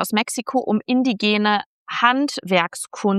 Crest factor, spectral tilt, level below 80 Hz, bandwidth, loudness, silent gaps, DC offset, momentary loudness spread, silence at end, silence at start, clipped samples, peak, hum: 18 dB; -4 dB/octave; -72 dBFS; 13.5 kHz; -20 LUFS; 1.66-1.86 s; under 0.1%; 6 LU; 0 s; 0 s; under 0.1%; -2 dBFS; none